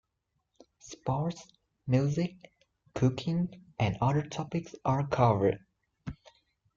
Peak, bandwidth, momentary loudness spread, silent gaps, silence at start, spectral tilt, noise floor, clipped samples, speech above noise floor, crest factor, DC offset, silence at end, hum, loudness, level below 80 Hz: -12 dBFS; 7.4 kHz; 19 LU; none; 0.85 s; -7.5 dB/octave; -81 dBFS; under 0.1%; 52 dB; 20 dB; under 0.1%; 0.6 s; none; -31 LUFS; -58 dBFS